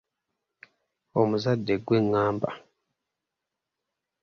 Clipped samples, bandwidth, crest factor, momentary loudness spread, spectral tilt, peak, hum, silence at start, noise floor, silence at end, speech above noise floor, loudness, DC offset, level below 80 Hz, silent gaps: under 0.1%; 7 kHz; 22 dB; 9 LU; -8 dB/octave; -8 dBFS; none; 1.15 s; -86 dBFS; 1.65 s; 61 dB; -26 LUFS; under 0.1%; -62 dBFS; none